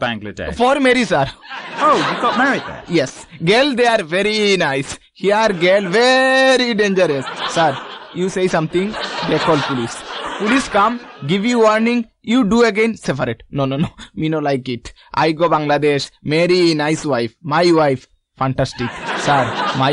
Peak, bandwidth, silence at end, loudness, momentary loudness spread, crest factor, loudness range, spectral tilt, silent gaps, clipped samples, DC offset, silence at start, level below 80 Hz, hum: -2 dBFS; 11 kHz; 0 s; -16 LUFS; 10 LU; 14 dB; 4 LU; -5 dB/octave; none; under 0.1%; under 0.1%; 0 s; -46 dBFS; none